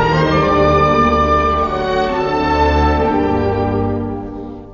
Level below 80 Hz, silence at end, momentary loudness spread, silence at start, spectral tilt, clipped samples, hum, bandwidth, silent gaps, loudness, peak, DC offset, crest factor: -26 dBFS; 0 s; 9 LU; 0 s; -7 dB/octave; under 0.1%; none; 7.2 kHz; none; -15 LUFS; 0 dBFS; under 0.1%; 14 dB